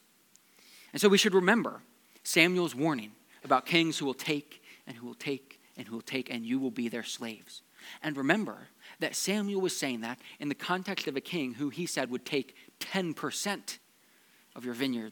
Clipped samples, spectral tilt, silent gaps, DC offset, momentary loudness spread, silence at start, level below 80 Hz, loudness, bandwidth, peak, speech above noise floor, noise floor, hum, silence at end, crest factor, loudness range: under 0.1%; -3.5 dB/octave; none; under 0.1%; 22 LU; 0.75 s; under -90 dBFS; -31 LUFS; 19 kHz; -8 dBFS; 33 dB; -64 dBFS; none; 0 s; 26 dB; 8 LU